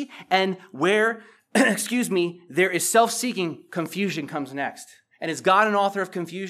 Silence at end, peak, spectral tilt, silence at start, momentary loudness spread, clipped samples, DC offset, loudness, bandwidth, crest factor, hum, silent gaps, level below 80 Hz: 0 s; -4 dBFS; -3.5 dB/octave; 0 s; 12 LU; under 0.1%; under 0.1%; -23 LUFS; 15 kHz; 20 dB; none; none; -86 dBFS